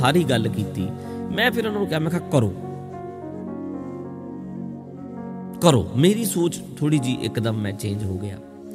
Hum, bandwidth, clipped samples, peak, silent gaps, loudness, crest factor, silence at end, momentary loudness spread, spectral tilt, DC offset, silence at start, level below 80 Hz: none; 16 kHz; under 0.1%; 0 dBFS; none; -23 LUFS; 22 dB; 0 s; 16 LU; -5.5 dB/octave; under 0.1%; 0 s; -54 dBFS